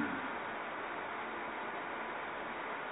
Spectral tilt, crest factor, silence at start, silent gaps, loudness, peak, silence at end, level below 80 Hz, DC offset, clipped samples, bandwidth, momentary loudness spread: 1.5 dB/octave; 16 dB; 0 s; none; -41 LUFS; -24 dBFS; 0 s; -72 dBFS; under 0.1%; under 0.1%; 3.9 kHz; 1 LU